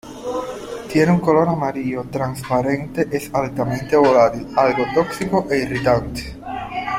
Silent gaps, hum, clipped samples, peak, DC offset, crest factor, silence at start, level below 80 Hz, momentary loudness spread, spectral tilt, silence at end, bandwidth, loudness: none; none; under 0.1%; -2 dBFS; under 0.1%; 18 dB; 0.05 s; -44 dBFS; 12 LU; -6.5 dB/octave; 0 s; 16 kHz; -19 LUFS